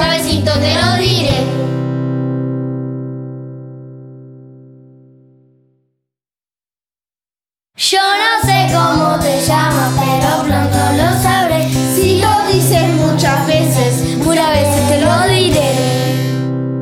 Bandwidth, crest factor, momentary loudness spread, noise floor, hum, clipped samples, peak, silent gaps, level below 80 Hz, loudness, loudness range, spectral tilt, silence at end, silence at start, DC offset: 17.5 kHz; 14 dB; 9 LU; under -90 dBFS; none; under 0.1%; 0 dBFS; none; -34 dBFS; -13 LUFS; 12 LU; -5 dB/octave; 0 s; 0 s; under 0.1%